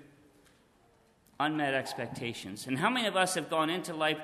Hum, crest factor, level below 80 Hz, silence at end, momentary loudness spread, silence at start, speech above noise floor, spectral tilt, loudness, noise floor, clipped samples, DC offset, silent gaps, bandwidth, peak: none; 20 dB; -72 dBFS; 0 s; 10 LU; 0 s; 34 dB; -3.5 dB/octave; -31 LUFS; -65 dBFS; under 0.1%; under 0.1%; none; 13.5 kHz; -12 dBFS